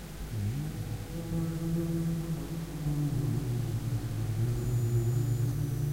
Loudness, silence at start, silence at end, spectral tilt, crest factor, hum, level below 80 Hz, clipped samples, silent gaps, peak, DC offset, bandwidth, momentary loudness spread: -33 LUFS; 0 s; 0 s; -7 dB/octave; 12 dB; none; -44 dBFS; under 0.1%; none; -18 dBFS; under 0.1%; 16 kHz; 7 LU